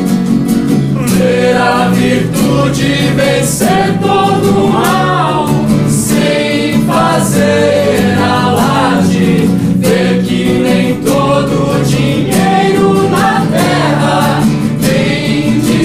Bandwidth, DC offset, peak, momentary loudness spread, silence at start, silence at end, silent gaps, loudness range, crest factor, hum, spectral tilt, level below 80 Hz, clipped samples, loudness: 16 kHz; under 0.1%; 0 dBFS; 2 LU; 0 s; 0 s; none; 1 LU; 10 dB; none; -5.5 dB/octave; -34 dBFS; under 0.1%; -10 LUFS